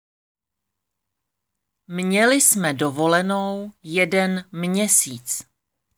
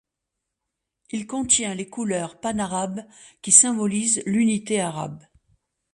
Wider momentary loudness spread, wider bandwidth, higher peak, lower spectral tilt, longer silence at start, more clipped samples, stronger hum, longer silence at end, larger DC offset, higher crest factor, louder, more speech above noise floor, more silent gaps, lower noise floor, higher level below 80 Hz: second, 13 LU vs 19 LU; first, over 20 kHz vs 11.5 kHz; about the same, -2 dBFS vs 0 dBFS; about the same, -3 dB/octave vs -3 dB/octave; first, 1.9 s vs 1.15 s; neither; neither; second, 0.55 s vs 0.75 s; neither; about the same, 20 dB vs 24 dB; about the same, -19 LUFS vs -21 LUFS; about the same, 62 dB vs 60 dB; neither; about the same, -83 dBFS vs -83 dBFS; second, -72 dBFS vs -60 dBFS